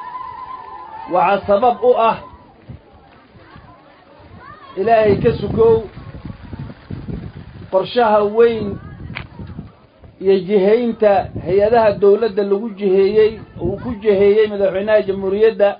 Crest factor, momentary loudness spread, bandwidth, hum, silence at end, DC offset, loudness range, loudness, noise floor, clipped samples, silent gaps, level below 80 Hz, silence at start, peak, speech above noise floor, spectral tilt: 14 dB; 20 LU; 5.2 kHz; none; 0 s; under 0.1%; 5 LU; -15 LUFS; -45 dBFS; under 0.1%; none; -42 dBFS; 0 s; -2 dBFS; 31 dB; -11.5 dB/octave